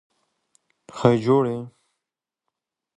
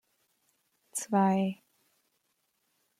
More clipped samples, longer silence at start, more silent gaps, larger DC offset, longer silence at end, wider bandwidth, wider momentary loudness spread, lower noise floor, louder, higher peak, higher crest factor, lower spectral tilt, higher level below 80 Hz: neither; about the same, 0.95 s vs 0.95 s; neither; neither; second, 1.3 s vs 1.45 s; second, 10.5 kHz vs 14.5 kHz; first, 23 LU vs 13 LU; first, -87 dBFS vs -77 dBFS; first, -21 LUFS vs -30 LUFS; first, -2 dBFS vs -16 dBFS; about the same, 22 dB vs 18 dB; first, -8 dB/octave vs -6 dB/octave; first, -60 dBFS vs -80 dBFS